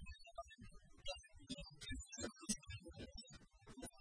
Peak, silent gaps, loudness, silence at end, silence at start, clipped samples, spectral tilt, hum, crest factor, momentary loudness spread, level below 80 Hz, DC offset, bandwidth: -28 dBFS; none; -52 LUFS; 0 s; 0 s; under 0.1%; -3 dB/octave; none; 26 dB; 16 LU; -60 dBFS; under 0.1%; 10.5 kHz